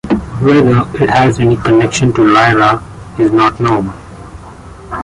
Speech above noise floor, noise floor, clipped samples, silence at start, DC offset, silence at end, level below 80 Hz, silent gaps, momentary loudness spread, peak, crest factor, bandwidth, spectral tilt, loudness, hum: 22 dB; -32 dBFS; under 0.1%; 0.05 s; under 0.1%; 0 s; -34 dBFS; none; 17 LU; 0 dBFS; 12 dB; 11.5 kHz; -6.5 dB/octave; -10 LUFS; none